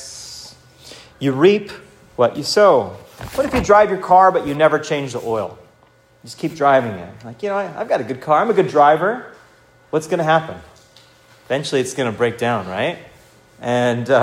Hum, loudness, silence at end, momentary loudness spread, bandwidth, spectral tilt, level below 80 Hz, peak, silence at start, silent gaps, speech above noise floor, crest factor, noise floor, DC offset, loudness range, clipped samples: none; -17 LUFS; 0 s; 19 LU; 16 kHz; -5 dB/octave; -48 dBFS; 0 dBFS; 0 s; none; 36 dB; 18 dB; -53 dBFS; under 0.1%; 6 LU; under 0.1%